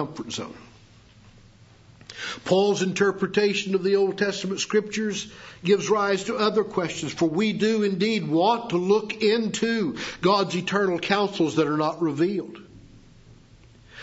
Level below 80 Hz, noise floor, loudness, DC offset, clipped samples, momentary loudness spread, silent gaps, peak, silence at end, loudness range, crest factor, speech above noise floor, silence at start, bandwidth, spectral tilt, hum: -60 dBFS; -52 dBFS; -24 LUFS; under 0.1%; under 0.1%; 10 LU; none; -4 dBFS; 0 s; 3 LU; 20 dB; 28 dB; 0 s; 8 kHz; -5 dB/octave; none